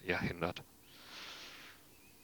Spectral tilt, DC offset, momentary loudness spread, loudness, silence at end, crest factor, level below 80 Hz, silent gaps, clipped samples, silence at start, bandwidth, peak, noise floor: -5 dB/octave; under 0.1%; 21 LU; -42 LUFS; 0 s; 26 dB; -64 dBFS; none; under 0.1%; 0 s; over 20 kHz; -18 dBFS; -62 dBFS